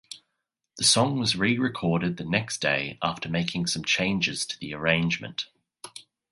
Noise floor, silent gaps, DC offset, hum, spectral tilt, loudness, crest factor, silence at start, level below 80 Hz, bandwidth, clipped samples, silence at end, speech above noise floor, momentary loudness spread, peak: -82 dBFS; none; under 0.1%; none; -3.5 dB/octave; -25 LUFS; 22 dB; 0.1 s; -56 dBFS; 11.5 kHz; under 0.1%; 0.3 s; 56 dB; 19 LU; -6 dBFS